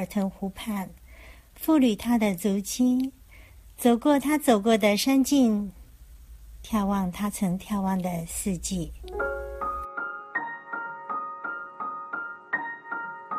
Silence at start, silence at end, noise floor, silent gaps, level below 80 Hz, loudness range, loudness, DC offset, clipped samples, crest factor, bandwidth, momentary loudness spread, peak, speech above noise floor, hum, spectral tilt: 0 s; 0 s; -49 dBFS; none; -48 dBFS; 9 LU; -27 LUFS; under 0.1%; under 0.1%; 18 dB; 15.5 kHz; 13 LU; -8 dBFS; 25 dB; none; -5 dB/octave